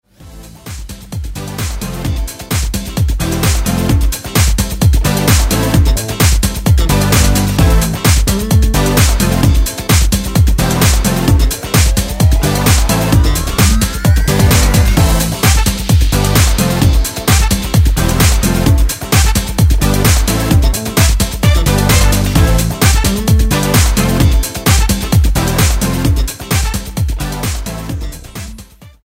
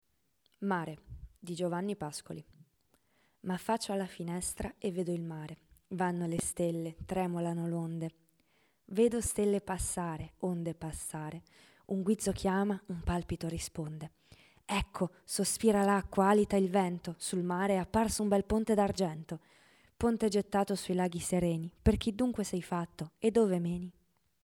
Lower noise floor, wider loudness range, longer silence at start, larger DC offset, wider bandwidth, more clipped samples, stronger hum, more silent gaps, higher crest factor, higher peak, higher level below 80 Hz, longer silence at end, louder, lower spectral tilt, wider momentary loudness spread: second, -35 dBFS vs -76 dBFS; second, 4 LU vs 8 LU; second, 0.2 s vs 0.6 s; neither; second, 16.5 kHz vs 18.5 kHz; neither; neither; neither; second, 12 dB vs 20 dB; first, 0 dBFS vs -14 dBFS; first, -14 dBFS vs -52 dBFS; second, 0.2 s vs 0.55 s; first, -12 LUFS vs -33 LUFS; about the same, -4.5 dB/octave vs -5.5 dB/octave; second, 9 LU vs 14 LU